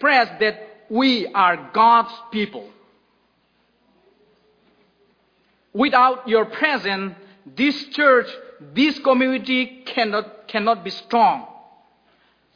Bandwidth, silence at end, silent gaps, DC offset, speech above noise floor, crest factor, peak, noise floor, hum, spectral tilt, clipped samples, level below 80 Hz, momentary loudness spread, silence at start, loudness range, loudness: 5.2 kHz; 1.1 s; none; under 0.1%; 45 dB; 20 dB; -2 dBFS; -64 dBFS; none; -5.5 dB/octave; under 0.1%; -68 dBFS; 13 LU; 0 s; 5 LU; -19 LUFS